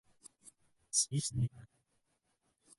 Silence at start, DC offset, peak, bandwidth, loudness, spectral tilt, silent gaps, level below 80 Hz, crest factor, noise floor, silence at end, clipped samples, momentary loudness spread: 0.45 s; under 0.1%; -18 dBFS; 11.5 kHz; -35 LUFS; -3.5 dB/octave; none; -66 dBFS; 24 dB; -80 dBFS; 1.15 s; under 0.1%; 25 LU